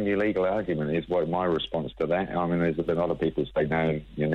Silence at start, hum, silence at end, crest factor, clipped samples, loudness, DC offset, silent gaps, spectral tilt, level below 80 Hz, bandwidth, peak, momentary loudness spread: 0 s; none; 0 s; 14 dB; under 0.1%; -27 LUFS; under 0.1%; none; -8.5 dB/octave; -50 dBFS; 5.8 kHz; -12 dBFS; 3 LU